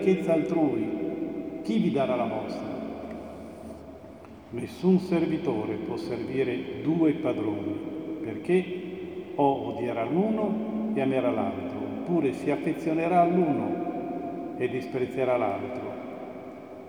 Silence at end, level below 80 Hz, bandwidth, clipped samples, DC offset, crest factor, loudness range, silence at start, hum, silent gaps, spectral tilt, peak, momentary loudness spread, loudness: 0 s; -62 dBFS; 15.5 kHz; under 0.1%; under 0.1%; 18 dB; 4 LU; 0 s; none; none; -8 dB/octave; -10 dBFS; 15 LU; -28 LUFS